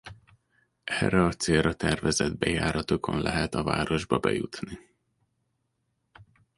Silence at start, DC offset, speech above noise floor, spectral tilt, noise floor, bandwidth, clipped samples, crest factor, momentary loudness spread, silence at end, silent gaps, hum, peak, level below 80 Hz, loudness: 0.05 s; under 0.1%; 50 dB; -5 dB/octave; -77 dBFS; 11.5 kHz; under 0.1%; 22 dB; 11 LU; 0.35 s; none; none; -8 dBFS; -46 dBFS; -27 LUFS